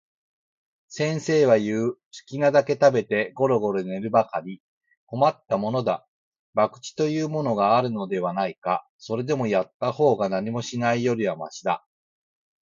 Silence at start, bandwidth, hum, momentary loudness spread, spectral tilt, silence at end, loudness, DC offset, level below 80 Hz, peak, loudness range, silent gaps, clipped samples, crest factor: 0.9 s; 7.6 kHz; none; 10 LU; -6 dB/octave; 0.85 s; -24 LUFS; under 0.1%; -68 dBFS; -4 dBFS; 4 LU; 2.05-2.11 s, 4.60-4.81 s, 4.97-5.07 s, 6.08-6.32 s, 6.39-6.53 s, 8.58-8.62 s, 8.89-8.99 s, 9.74-9.80 s; under 0.1%; 20 dB